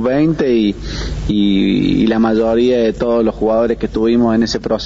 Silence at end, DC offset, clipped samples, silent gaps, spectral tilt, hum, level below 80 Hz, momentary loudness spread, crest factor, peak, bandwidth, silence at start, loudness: 0 s; 0.3%; under 0.1%; none; -5.5 dB/octave; none; -30 dBFS; 5 LU; 10 dB; -4 dBFS; 7.8 kHz; 0 s; -14 LUFS